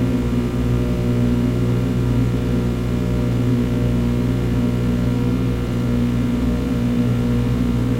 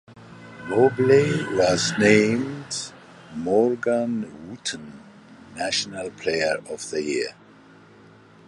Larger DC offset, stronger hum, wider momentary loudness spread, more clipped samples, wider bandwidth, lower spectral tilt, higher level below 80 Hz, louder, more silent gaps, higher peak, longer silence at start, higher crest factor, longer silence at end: neither; first, 60 Hz at -20 dBFS vs none; second, 2 LU vs 19 LU; neither; first, 15.5 kHz vs 11.5 kHz; first, -8 dB/octave vs -4.5 dB/octave; first, -26 dBFS vs -58 dBFS; first, -19 LUFS vs -22 LUFS; neither; second, -6 dBFS vs -2 dBFS; about the same, 0 s vs 0.1 s; second, 12 dB vs 22 dB; second, 0 s vs 1.15 s